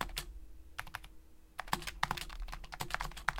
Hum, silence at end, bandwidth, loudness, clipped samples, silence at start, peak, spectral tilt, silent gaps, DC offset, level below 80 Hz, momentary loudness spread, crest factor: none; 0 s; 17 kHz; -42 LUFS; under 0.1%; 0 s; -10 dBFS; -2.5 dB/octave; none; under 0.1%; -50 dBFS; 13 LU; 32 dB